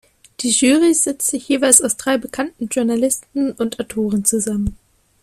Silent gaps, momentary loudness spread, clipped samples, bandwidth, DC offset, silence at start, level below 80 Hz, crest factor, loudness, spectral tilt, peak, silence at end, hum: none; 12 LU; under 0.1%; 16 kHz; under 0.1%; 0.4 s; -44 dBFS; 18 dB; -17 LUFS; -3 dB/octave; 0 dBFS; 0.5 s; none